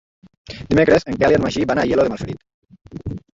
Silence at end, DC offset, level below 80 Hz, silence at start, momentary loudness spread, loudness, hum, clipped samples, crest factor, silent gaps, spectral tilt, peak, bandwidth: 0.15 s; under 0.1%; -42 dBFS; 0.5 s; 21 LU; -17 LUFS; none; under 0.1%; 18 dB; 2.54-2.62 s; -6.5 dB/octave; -2 dBFS; 7.8 kHz